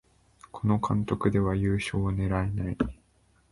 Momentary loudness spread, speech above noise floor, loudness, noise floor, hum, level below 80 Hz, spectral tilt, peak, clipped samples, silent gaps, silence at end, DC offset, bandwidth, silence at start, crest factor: 6 LU; 38 dB; -28 LUFS; -65 dBFS; none; -42 dBFS; -7.5 dB/octave; -10 dBFS; under 0.1%; none; 0.55 s; under 0.1%; 11.5 kHz; 0.55 s; 18 dB